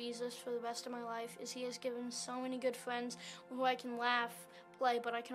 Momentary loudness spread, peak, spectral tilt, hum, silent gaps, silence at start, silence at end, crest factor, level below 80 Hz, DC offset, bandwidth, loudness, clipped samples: 10 LU; -22 dBFS; -2.5 dB/octave; none; none; 0 s; 0 s; 20 dB; under -90 dBFS; under 0.1%; 15.5 kHz; -40 LUFS; under 0.1%